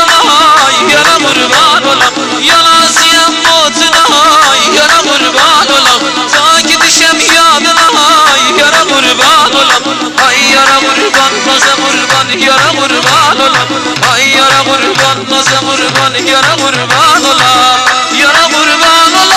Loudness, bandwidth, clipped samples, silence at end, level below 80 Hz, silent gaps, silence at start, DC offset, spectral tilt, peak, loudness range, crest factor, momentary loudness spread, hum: -5 LUFS; 18.5 kHz; 0.2%; 0 s; -42 dBFS; none; 0 s; under 0.1%; -1 dB/octave; 0 dBFS; 2 LU; 6 dB; 4 LU; none